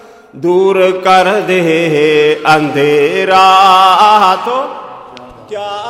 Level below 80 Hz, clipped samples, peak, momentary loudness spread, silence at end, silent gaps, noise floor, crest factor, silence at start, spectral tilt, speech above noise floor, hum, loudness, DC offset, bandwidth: -52 dBFS; 0.3%; 0 dBFS; 16 LU; 0 s; none; -32 dBFS; 10 dB; 0.35 s; -4.5 dB/octave; 23 dB; none; -9 LUFS; under 0.1%; 16 kHz